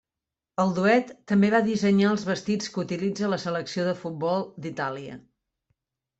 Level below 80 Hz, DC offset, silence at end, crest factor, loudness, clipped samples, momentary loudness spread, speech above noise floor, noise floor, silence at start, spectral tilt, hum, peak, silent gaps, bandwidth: -66 dBFS; under 0.1%; 1 s; 18 dB; -25 LUFS; under 0.1%; 10 LU; 64 dB; -89 dBFS; 0.6 s; -6 dB/octave; none; -8 dBFS; none; 8 kHz